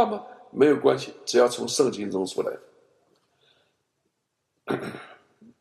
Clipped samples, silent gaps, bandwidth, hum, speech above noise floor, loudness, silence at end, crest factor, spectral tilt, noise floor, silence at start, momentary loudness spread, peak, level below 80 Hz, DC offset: under 0.1%; none; 13.5 kHz; none; 54 dB; -24 LUFS; 0.5 s; 20 dB; -4 dB/octave; -78 dBFS; 0 s; 17 LU; -6 dBFS; -74 dBFS; under 0.1%